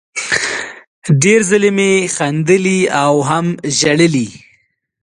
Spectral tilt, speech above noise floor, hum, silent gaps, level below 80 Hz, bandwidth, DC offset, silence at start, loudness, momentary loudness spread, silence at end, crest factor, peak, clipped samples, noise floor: -4.5 dB/octave; 46 dB; none; 0.87-1.02 s; -54 dBFS; 11.5 kHz; under 0.1%; 0.15 s; -13 LUFS; 9 LU; 0.65 s; 14 dB; 0 dBFS; under 0.1%; -58 dBFS